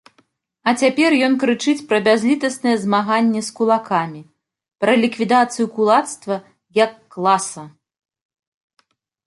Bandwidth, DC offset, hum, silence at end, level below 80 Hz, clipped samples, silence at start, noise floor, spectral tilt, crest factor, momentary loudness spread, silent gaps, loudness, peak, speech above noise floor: 11.5 kHz; under 0.1%; none; 1.6 s; -68 dBFS; under 0.1%; 0.65 s; -61 dBFS; -4.5 dB/octave; 16 dB; 8 LU; none; -18 LUFS; -2 dBFS; 44 dB